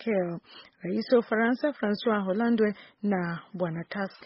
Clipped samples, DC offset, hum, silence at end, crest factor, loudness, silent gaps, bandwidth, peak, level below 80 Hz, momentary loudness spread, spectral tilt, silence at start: under 0.1%; under 0.1%; none; 0 s; 16 dB; -28 LUFS; none; 5.8 kHz; -12 dBFS; -70 dBFS; 10 LU; -5.5 dB/octave; 0 s